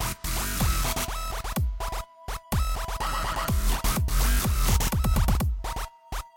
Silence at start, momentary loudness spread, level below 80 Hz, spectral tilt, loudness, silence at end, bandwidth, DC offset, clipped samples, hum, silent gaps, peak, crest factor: 0 s; 10 LU; -28 dBFS; -4 dB/octave; -28 LUFS; 0.1 s; 17 kHz; under 0.1%; under 0.1%; none; none; -10 dBFS; 16 dB